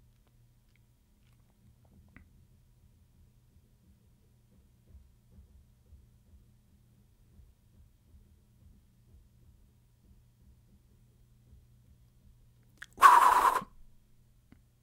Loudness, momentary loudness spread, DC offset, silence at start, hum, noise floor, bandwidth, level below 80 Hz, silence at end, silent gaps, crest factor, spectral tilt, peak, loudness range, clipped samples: -23 LUFS; 33 LU; under 0.1%; 13 s; none; -66 dBFS; 16 kHz; -64 dBFS; 1.2 s; none; 30 dB; -2 dB/octave; -6 dBFS; 1 LU; under 0.1%